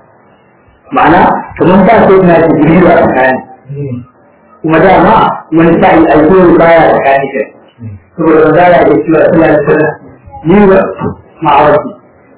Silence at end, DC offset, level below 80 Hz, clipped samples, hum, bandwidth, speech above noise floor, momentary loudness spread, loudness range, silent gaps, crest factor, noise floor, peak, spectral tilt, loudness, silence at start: 0.45 s; under 0.1%; -34 dBFS; 6%; none; 4 kHz; 38 dB; 14 LU; 2 LU; none; 6 dB; -43 dBFS; 0 dBFS; -11 dB/octave; -6 LUFS; 0.9 s